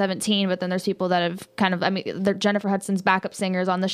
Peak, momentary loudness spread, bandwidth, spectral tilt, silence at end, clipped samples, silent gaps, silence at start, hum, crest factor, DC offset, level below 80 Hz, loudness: -6 dBFS; 3 LU; 14.5 kHz; -5 dB/octave; 0 s; under 0.1%; none; 0 s; none; 18 dB; under 0.1%; -66 dBFS; -23 LUFS